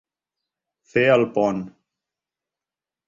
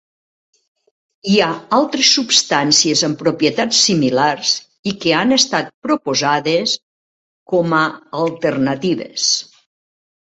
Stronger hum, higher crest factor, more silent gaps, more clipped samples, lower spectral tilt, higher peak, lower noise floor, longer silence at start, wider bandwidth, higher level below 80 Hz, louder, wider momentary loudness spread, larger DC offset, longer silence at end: neither; about the same, 20 dB vs 18 dB; second, none vs 4.79-4.83 s, 5.74-5.82 s, 6.83-7.46 s; neither; first, -6.5 dB/octave vs -3 dB/octave; second, -4 dBFS vs 0 dBFS; about the same, -90 dBFS vs under -90 dBFS; second, 0.95 s vs 1.25 s; second, 7.6 kHz vs 8.4 kHz; second, -64 dBFS vs -58 dBFS; second, -20 LUFS vs -15 LUFS; first, 14 LU vs 8 LU; neither; first, 1.4 s vs 0.8 s